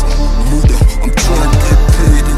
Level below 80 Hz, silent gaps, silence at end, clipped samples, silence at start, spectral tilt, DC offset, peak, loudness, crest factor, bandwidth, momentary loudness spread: -10 dBFS; none; 0 s; under 0.1%; 0 s; -5.5 dB/octave; under 0.1%; 0 dBFS; -12 LUFS; 8 dB; 14 kHz; 4 LU